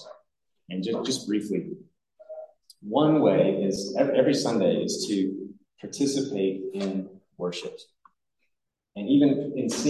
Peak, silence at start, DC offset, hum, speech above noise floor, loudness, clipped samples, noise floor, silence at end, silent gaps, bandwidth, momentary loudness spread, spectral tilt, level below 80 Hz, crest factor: -8 dBFS; 0 s; under 0.1%; none; 55 dB; -25 LUFS; under 0.1%; -80 dBFS; 0 s; none; 12.5 kHz; 22 LU; -5.5 dB/octave; -72 dBFS; 20 dB